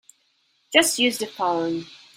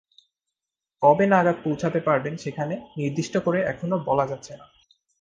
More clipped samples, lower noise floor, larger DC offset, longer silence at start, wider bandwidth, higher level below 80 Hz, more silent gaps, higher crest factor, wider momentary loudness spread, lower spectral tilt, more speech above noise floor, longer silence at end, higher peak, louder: neither; second, -66 dBFS vs -87 dBFS; neither; second, 0.7 s vs 1 s; first, 16.5 kHz vs 9.4 kHz; second, -68 dBFS vs -60 dBFS; neither; about the same, 22 dB vs 20 dB; about the same, 10 LU vs 12 LU; second, -1.5 dB/octave vs -7 dB/octave; second, 44 dB vs 64 dB; second, 0.2 s vs 0.65 s; about the same, -2 dBFS vs -4 dBFS; about the same, -21 LUFS vs -23 LUFS